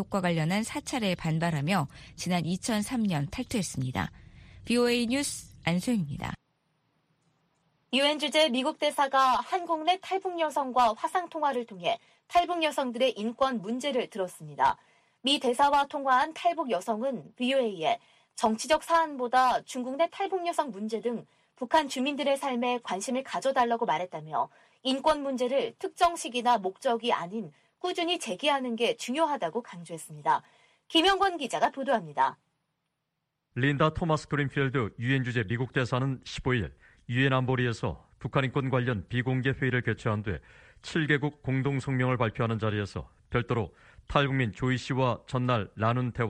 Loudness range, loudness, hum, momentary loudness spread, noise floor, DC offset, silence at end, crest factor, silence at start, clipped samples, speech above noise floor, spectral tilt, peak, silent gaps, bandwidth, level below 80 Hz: 3 LU; -29 LUFS; none; 9 LU; -82 dBFS; under 0.1%; 0 s; 20 dB; 0 s; under 0.1%; 54 dB; -5 dB/octave; -8 dBFS; none; 15 kHz; -56 dBFS